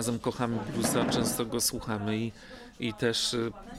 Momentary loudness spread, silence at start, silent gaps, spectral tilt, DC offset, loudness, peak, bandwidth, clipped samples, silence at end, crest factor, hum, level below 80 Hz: 9 LU; 0 s; none; -4 dB/octave; under 0.1%; -30 LUFS; -14 dBFS; 16.5 kHz; under 0.1%; 0 s; 16 dB; none; -54 dBFS